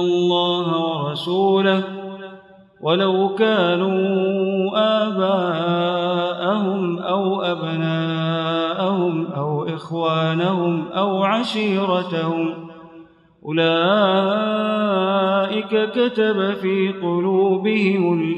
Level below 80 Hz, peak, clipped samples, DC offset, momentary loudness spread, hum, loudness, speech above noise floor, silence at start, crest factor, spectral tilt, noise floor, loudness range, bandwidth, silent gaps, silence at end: -70 dBFS; -4 dBFS; under 0.1%; under 0.1%; 6 LU; none; -19 LUFS; 27 dB; 0 s; 16 dB; -7.5 dB/octave; -46 dBFS; 3 LU; 10.5 kHz; none; 0 s